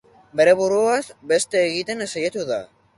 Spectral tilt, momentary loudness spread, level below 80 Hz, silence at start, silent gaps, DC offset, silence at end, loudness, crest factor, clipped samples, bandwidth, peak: -3 dB/octave; 10 LU; -64 dBFS; 0.35 s; none; under 0.1%; 0.35 s; -21 LUFS; 16 dB; under 0.1%; 11.5 kHz; -4 dBFS